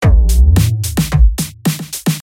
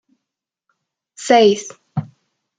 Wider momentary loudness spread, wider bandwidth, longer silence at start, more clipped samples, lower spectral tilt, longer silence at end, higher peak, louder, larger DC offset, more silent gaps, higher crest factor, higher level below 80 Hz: second, 8 LU vs 16 LU; first, 17 kHz vs 9.4 kHz; second, 0 s vs 1.2 s; neither; about the same, -5.5 dB/octave vs -4.5 dB/octave; second, 0 s vs 0.55 s; about the same, 0 dBFS vs -2 dBFS; about the same, -14 LUFS vs -16 LUFS; neither; neither; second, 10 dB vs 18 dB; first, -14 dBFS vs -66 dBFS